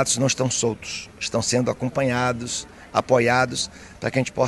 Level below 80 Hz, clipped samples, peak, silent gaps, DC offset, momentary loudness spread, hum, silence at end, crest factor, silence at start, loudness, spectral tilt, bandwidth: -52 dBFS; under 0.1%; -4 dBFS; none; under 0.1%; 11 LU; none; 0 s; 20 dB; 0 s; -23 LUFS; -4 dB/octave; 12.5 kHz